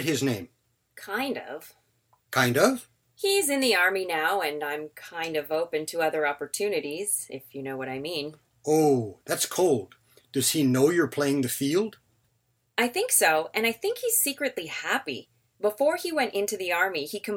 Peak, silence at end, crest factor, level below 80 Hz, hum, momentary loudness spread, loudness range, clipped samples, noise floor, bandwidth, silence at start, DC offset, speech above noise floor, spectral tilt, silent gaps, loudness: -6 dBFS; 0 s; 20 dB; -72 dBFS; none; 12 LU; 4 LU; under 0.1%; -72 dBFS; 17 kHz; 0 s; under 0.1%; 45 dB; -3 dB/octave; none; -26 LUFS